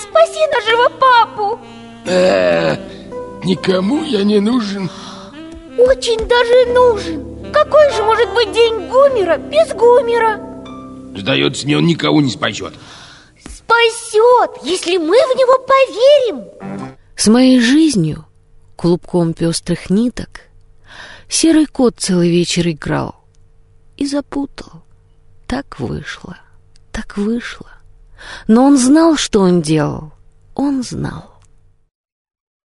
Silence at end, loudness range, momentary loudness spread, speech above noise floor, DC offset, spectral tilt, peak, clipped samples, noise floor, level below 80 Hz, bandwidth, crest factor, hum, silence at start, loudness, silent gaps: 1.45 s; 10 LU; 19 LU; 35 dB; under 0.1%; -5 dB/octave; 0 dBFS; under 0.1%; -48 dBFS; -40 dBFS; 11.5 kHz; 14 dB; none; 0 s; -13 LUFS; none